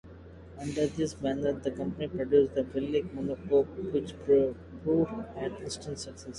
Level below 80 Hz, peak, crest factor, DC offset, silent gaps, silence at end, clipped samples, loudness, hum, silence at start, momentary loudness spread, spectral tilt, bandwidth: -52 dBFS; -12 dBFS; 18 dB; under 0.1%; none; 0 s; under 0.1%; -30 LUFS; none; 0.05 s; 13 LU; -6.5 dB/octave; 11 kHz